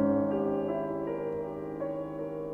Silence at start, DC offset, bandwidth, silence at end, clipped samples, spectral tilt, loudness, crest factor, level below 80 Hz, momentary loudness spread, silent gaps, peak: 0 s; under 0.1%; 3.6 kHz; 0 s; under 0.1%; -10 dB/octave; -33 LUFS; 16 dB; -60 dBFS; 8 LU; none; -16 dBFS